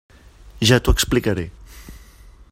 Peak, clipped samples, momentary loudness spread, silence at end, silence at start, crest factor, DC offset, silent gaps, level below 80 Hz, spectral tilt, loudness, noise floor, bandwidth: 0 dBFS; under 0.1%; 11 LU; 0.55 s; 0.45 s; 20 dB; under 0.1%; none; -28 dBFS; -4.5 dB/octave; -18 LUFS; -45 dBFS; 16 kHz